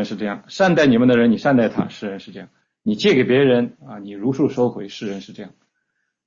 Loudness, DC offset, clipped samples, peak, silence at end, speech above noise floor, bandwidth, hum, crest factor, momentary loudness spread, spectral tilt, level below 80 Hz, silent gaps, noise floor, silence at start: -18 LUFS; under 0.1%; under 0.1%; -4 dBFS; 0.8 s; 55 dB; 7.4 kHz; none; 16 dB; 20 LU; -6.5 dB/octave; -58 dBFS; none; -73 dBFS; 0 s